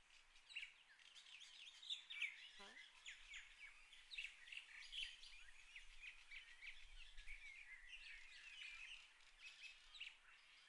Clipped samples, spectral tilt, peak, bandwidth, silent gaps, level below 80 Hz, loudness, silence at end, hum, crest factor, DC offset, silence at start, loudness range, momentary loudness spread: under 0.1%; 1 dB/octave; -36 dBFS; 11 kHz; none; -72 dBFS; -56 LUFS; 0 s; none; 24 dB; under 0.1%; 0 s; 5 LU; 12 LU